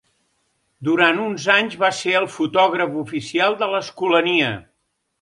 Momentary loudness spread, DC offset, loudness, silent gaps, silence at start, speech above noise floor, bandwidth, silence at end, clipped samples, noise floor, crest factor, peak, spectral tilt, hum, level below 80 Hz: 7 LU; under 0.1%; -19 LUFS; none; 0.8 s; 53 dB; 11.5 kHz; 0.6 s; under 0.1%; -72 dBFS; 20 dB; 0 dBFS; -4 dB/octave; none; -64 dBFS